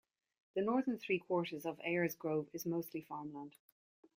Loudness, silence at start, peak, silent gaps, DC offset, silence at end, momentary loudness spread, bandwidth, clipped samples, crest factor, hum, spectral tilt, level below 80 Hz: -39 LUFS; 0.55 s; -22 dBFS; none; under 0.1%; 0.65 s; 11 LU; 16.5 kHz; under 0.1%; 18 dB; none; -6 dB/octave; -82 dBFS